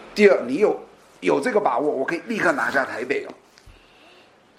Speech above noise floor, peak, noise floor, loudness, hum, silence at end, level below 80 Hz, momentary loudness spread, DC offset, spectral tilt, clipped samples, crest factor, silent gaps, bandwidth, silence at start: 32 dB; -2 dBFS; -52 dBFS; -21 LUFS; none; 0.9 s; -62 dBFS; 10 LU; under 0.1%; -5 dB/octave; under 0.1%; 22 dB; none; 13.5 kHz; 0 s